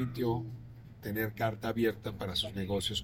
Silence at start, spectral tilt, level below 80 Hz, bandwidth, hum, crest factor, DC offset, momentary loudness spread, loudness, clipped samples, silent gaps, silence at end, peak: 0 s; -5.5 dB/octave; -56 dBFS; 16.5 kHz; none; 18 dB; under 0.1%; 13 LU; -34 LUFS; under 0.1%; none; 0 s; -18 dBFS